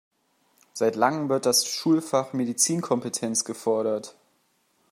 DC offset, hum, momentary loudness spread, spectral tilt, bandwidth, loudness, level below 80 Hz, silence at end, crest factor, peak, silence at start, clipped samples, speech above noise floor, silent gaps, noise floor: under 0.1%; none; 7 LU; -3.5 dB/octave; 16 kHz; -24 LUFS; -74 dBFS; 0.8 s; 20 dB; -6 dBFS; 0.75 s; under 0.1%; 44 dB; none; -68 dBFS